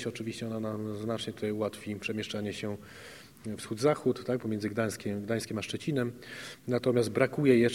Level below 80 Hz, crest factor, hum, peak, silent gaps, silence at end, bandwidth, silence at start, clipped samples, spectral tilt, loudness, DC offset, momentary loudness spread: -66 dBFS; 22 dB; none; -10 dBFS; none; 0 s; 16.5 kHz; 0 s; under 0.1%; -6 dB/octave; -32 LUFS; under 0.1%; 14 LU